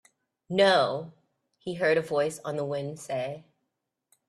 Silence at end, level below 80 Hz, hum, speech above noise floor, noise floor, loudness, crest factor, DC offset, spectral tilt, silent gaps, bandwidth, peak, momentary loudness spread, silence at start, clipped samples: 0.85 s; -72 dBFS; none; 56 dB; -82 dBFS; -27 LUFS; 22 dB; under 0.1%; -4.5 dB/octave; none; 13 kHz; -8 dBFS; 17 LU; 0.5 s; under 0.1%